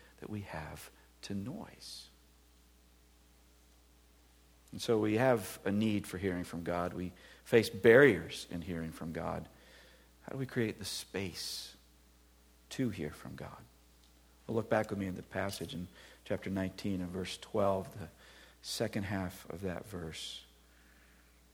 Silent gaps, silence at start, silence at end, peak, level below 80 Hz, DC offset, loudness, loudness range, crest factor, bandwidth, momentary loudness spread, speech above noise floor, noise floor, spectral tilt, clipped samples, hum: none; 0.2 s; 1.1 s; -12 dBFS; -62 dBFS; under 0.1%; -35 LUFS; 16 LU; 26 dB; 18.5 kHz; 19 LU; 29 dB; -64 dBFS; -5.5 dB/octave; under 0.1%; none